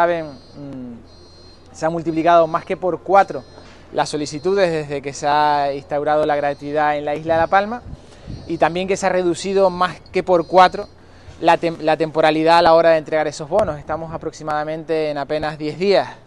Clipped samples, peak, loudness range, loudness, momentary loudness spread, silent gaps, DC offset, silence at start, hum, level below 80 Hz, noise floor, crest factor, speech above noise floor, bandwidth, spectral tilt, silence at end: under 0.1%; 0 dBFS; 4 LU; -18 LUFS; 15 LU; none; under 0.1%; 0 s; none; -48 dBFS; -43 dBFS; 18 dB; 25 dB; 11.5 kHz; -5 dB/octave; 0.1 s